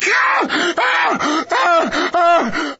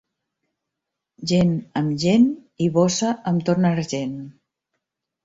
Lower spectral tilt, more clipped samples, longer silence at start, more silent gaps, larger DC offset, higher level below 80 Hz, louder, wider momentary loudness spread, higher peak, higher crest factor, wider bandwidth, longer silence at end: second, 0 dB/octave vs -6 dB/octave; neither; second, 0 s vs 1.2 s; neither; neither; about the same, -54 dBFS vs -56 dBFS; first, -15 LUFS vs -21 LUFS; second, 4 LU vs 12 LU; about the same, -4 dBFS vs -6 dBFS; about the same, 12 dB vs 16 dB; about the same, 8 kHz vs 7.8 kHz; second, 0.05 s vs 0.95 s